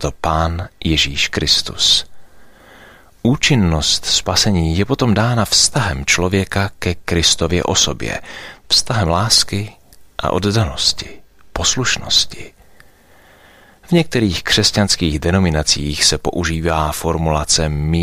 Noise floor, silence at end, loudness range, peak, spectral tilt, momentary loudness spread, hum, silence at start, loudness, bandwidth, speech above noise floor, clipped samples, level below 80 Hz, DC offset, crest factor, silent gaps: -47 dBFS; 0 s; 3 LU; 0 dBFS; -3.5 dB/octave; 10 LU; none; 0 s; -15 LUFS; 15.5 kHz; 31 dB; under 0.1%; -32 dBFS; under 0.1%; 16 dB; none